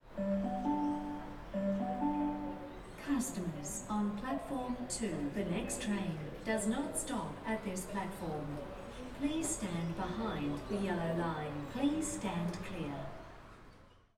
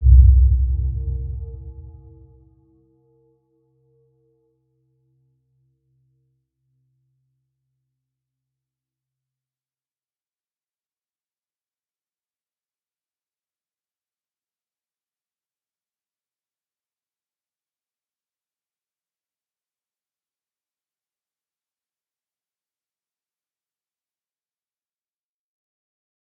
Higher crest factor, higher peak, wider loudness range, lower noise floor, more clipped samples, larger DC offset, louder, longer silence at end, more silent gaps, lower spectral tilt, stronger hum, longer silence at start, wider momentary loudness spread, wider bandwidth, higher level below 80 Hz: second, 16 dB vs 26 dB; second, -22 dBFS vs -2 dBFS; second, 2 LU vs 28 LU; second, -59 dBFS vs under -90 dBFS; neither; neither; second, -38 LUFS vs -18 LUFS; second, 0.3 s vs 24.3 s; neither; second, -5 dB/octave vs -19.5 dB/octave; neither; about the same, 0.05 s vs 0 s; second, 10 LU vs 28 LU; first, 16.5 kHz vs 0.5 kHz; second, -54 dBFS vs -26 dBFS